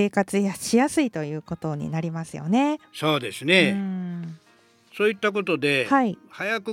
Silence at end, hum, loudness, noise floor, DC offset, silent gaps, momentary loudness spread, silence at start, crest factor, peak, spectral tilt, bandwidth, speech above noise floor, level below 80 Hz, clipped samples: 0 s; none; -24 LUFS; -58 dBFS; under 0.1%; none; 12 LU; 0 s; 20 dB; -4 dBFS; -5 dB/octave; 16.5 kHz; 34 dB; -64 dBFS; under 0.1%